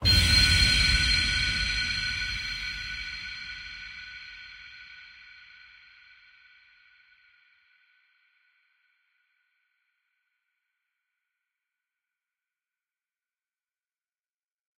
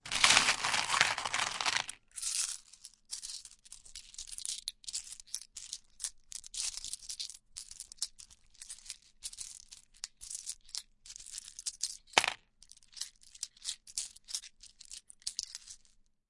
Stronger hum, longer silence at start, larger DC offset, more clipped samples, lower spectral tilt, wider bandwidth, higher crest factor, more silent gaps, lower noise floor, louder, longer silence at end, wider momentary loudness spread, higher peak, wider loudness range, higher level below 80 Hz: neither; about the same, 0 s vs 0.05 s; neither; neither; first, -2 dB/octave vs 1 dB/octave; first, 16 kHz vs 11.5 kHz; second, 22 dB vs 36 dB; neither; first, under -90 dBFS vs -66 dBFS; first, -24 LUFS vs -35 LUFS; first, 9.5 s vs 0.55 s; first, 26 LU vs 20 LU; second, -8 dBFS vs -2 dBFS; first, 26 LU vs 10 LU; first, -40 dBFS vs -64 dBFS